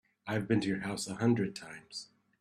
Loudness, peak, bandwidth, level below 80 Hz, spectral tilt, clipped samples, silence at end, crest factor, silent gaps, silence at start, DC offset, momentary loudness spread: -33 LUFS; -16 dBFS; 13.5 kHz; -68 dBFS; -5.5 dB/octave; under 0.1%; 0.35 s; 18 dB; none; 0.25 s; under 0.1%; 15 LU